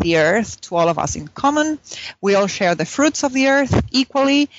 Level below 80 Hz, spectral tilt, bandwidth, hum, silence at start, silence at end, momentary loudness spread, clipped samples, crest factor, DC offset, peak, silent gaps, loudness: -40 dBFS; -3.5 dB/octave; 8 kHz; none; 0 s; 0.15 s; 7 LU; under 0.1%; 14 dB; under 0.1%; -4 dBFS; none; -18 LUFS